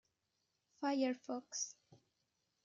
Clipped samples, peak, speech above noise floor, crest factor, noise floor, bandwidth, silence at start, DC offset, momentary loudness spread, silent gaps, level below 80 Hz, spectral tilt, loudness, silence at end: under 0.1%; -24 dBFS; 45 dB; 20 dB; -86 dBFS; 7.6 kHz; 0.8 s; under 0.1%; 8 LU; none; under -90 dBFS; -2 dB/octave; -41 LUFS; 0.7 s